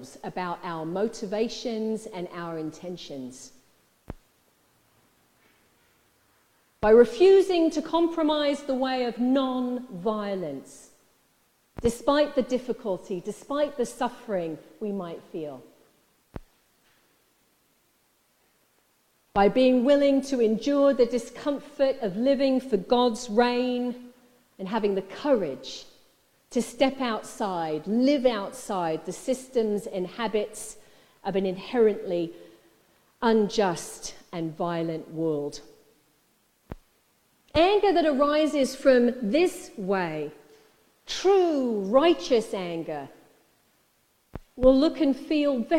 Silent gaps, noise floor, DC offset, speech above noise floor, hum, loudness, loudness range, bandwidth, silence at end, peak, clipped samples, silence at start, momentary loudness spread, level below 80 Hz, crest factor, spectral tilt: none; -67 dBFS; under 0.1%; 43 dB; none; -25 LUFS; 11 LU; 16 kHz; 0 s; -6 dBFS; under 0.1%; 0 s; 17 LU; -54 dBFS; 20 dB; -5 dB/octave